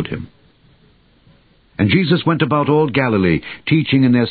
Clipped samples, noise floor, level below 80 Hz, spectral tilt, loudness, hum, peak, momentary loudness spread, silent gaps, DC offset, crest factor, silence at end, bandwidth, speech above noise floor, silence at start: under 0.1%; -53 dBFS; -42 dBFS; -12 dB/octave; -16 LUFS; none; -2 dBFS; 13 LU; none; under 0.1%; 16 dB; 0 s; 4.8 kHz; 38 dB; 0 s